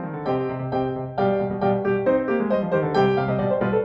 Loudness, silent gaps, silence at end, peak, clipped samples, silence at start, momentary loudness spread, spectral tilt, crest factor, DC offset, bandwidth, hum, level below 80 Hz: -23 LUFS; none; 0 s; -8 dBFS; under 0.1%; 0 s; 5 LU; -9 dB/octave; 14 dB; under 0.1%; 6 kHz; none; -52 dBFS